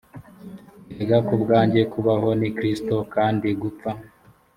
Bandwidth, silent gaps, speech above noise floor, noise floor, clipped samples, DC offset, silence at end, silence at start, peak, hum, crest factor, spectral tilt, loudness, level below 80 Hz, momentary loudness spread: 14 kHz; none; 21 dB; -42 dBFS; under 0.1%; under 0.1%; 0.5 s; 0.15 s; -4 dBFS; none; 18 dB; -8 dB/octave; -22 LUFS; -56 dBFS; 23 LU